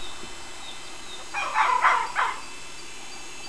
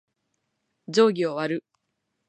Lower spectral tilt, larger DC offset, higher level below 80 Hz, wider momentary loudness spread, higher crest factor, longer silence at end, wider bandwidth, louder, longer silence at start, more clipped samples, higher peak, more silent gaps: second, -0.5 dB/octave vs -5 dB/octave; first, 1% vs under 0.1%; first, -54 dBFS vs -80 dBFS; first, 18 LU vs 10 LU; about the same, 22 dB vs 20 dB; second, 0 s vs 0.7 s; first, 11 kHz vs 9.2 kHz; about the same, -24 LUFS vs -24 LUFS; second, 0 s vs 0.9 s; neither; about the same, -6 dBFS vs -6 dBFS; neither